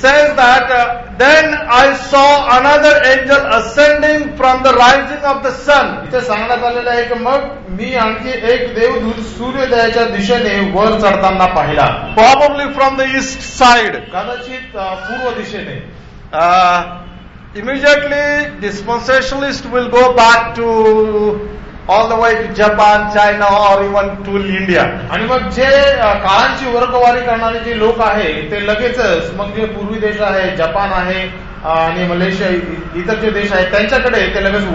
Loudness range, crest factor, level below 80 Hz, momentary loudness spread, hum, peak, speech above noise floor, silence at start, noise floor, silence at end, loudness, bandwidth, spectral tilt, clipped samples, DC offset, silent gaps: 7 LU; 12 dB; -32 dBFS; 12 LU; none; 0 dBFS; 21 dB; 0 s; -33 dBFS; 0 s; -11 LUFS; 8 kHz; -4.5 dB/octave; under 0.1%; under 0.1%; none